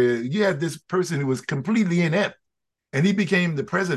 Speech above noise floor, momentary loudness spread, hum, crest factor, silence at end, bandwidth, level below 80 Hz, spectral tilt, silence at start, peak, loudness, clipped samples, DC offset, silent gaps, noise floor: 60 dB; 5 LU; none; 16 dB; 0 s; 12.5 kHz; -66 dBFS; -6 dB/octave; 0 s; -6 dBFS; -23 LUFS; under 0.1%; under 0.1%; none; -82 dBFS